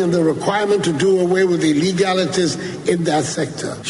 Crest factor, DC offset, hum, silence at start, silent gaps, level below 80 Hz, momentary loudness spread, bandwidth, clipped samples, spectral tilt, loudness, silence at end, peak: 14 dB; under 0.1%; none; 0 s; none; -54 dBFS; 6 LU; 11.5 kHz; under 0.1%; -5 dB/octave; -17 LUFS; 0 s; -4 dBFS